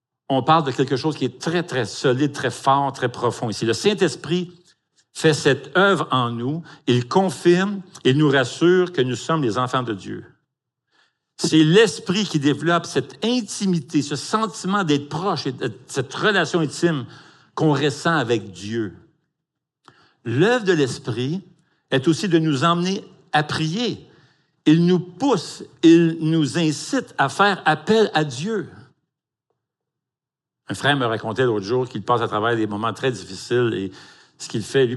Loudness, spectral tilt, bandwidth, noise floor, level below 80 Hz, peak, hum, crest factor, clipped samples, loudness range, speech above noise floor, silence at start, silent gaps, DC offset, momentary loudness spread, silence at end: -20 LUFS; -5.5 dB/octave; 12 kHz; -88 dBFS; -70 dBFS; -2 dBFS; none; 20 dB; under 0.1%; 5 LU; 68 dB; 0.3 s; none; under 0.1%; 10 LU; 0 s